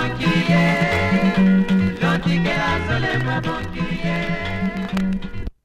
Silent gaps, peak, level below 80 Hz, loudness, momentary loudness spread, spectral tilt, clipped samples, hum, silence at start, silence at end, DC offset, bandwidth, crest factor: none; -4 dBFS; -36 dBFS; -19 LUFS; 8 LU; -7 dB/octave; under 0.1%; none; 0 s; 0.15 s; under 0.1%; 10.5 kHz; 14 dB